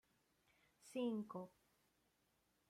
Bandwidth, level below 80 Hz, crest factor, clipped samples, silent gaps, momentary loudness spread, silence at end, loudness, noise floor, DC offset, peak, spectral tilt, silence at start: 15.5 kHz; under -90 dBFS; 18 dB; under 0.1%; none; 17 LU; 1.2 s; -47 LUFS; -83 dBFS; under 0.1%; -34 dBFS; -6 dB/octave; 0.85 s